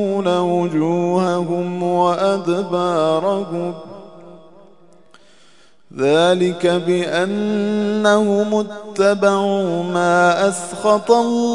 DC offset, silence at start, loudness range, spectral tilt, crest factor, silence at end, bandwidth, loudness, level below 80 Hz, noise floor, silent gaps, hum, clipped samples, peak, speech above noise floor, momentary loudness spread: 0.4%; 0 s; 6 LU; -5.5 dB/octave; 18 dB; 0 s; 11 kHz; -17 LUFS; -66 dBFS; -53 dBFS; none; none; under 0.1%; 0 dBFS; 36 dB; 7 LU